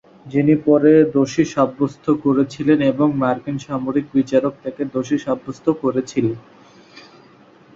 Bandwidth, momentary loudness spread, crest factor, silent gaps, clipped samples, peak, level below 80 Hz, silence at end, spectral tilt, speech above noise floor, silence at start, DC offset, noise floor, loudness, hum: 7.6 kHz; 10 LU; 16 dB; none; under 0.1%; -2 dBFS; -56 dBFS; 0.75 s; -7.5 dB/octave; 31 dB; 0.25 s; under 0.1%; -48 dBFS; -18 LUFS; none